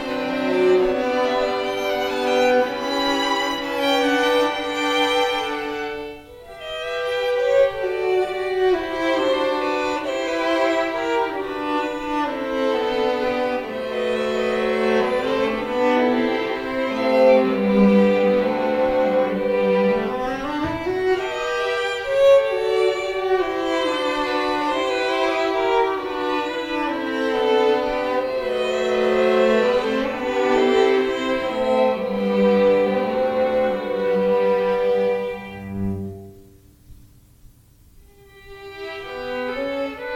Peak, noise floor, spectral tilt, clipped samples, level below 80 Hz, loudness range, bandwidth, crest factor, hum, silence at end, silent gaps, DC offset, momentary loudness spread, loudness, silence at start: -4 dBFS; -51 dBFS; -5 dB/octave; under 0.1%; -50 dBFS; 5 LU; 15.5 kHz; 16 dB; none; 0 s; none; under 0.1%; 9 LU; -20 LUFS; 0 s